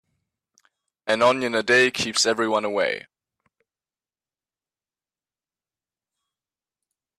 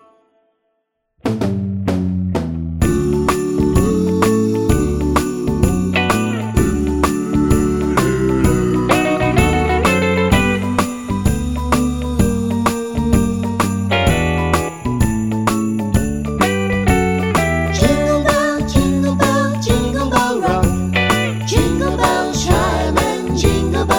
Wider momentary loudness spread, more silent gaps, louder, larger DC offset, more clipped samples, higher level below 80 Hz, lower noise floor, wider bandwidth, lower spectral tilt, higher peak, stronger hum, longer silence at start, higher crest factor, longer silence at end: first, 8 LU vs 5 LU; neither; second, -21 LUFS vs -16 LUFS; neither; neither; second, -68 dBFS vs -26 dBFS; first, under -90 dBFS vs -70 dBFS; second, 14 kHz vs 20 kHz; second, -2.5 dB/octave vs -5.5 dB/octave; second, -6 dBFS vs 0 dBFS; neither; second, 1.05 s vs 1.25 s; about the same, 20 dB vs 16 dB; first, 4.2 s vs 0 s